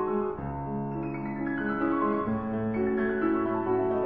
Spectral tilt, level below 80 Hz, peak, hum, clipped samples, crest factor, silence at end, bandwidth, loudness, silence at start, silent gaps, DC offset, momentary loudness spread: -11 dB/octave; -52 dBFS; -16 dBFS; none; under 0.1%; 14 dB; 0 s; 4.6 kHz; -29 LUFS; 0 s; none; 0.2%; 6 LU